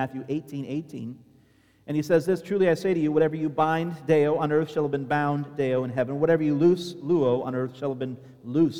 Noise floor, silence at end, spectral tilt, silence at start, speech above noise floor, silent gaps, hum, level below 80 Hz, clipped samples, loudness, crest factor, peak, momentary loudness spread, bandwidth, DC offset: -60 dBFS; 0 s; -7.5 dB/octave; 0 s; 35 dB; none; none; -66 dBFS; under 0.1%; -25 LUFS; 16 dB; -8 dBFS; 11 LU; 15 kHz; under 0.1%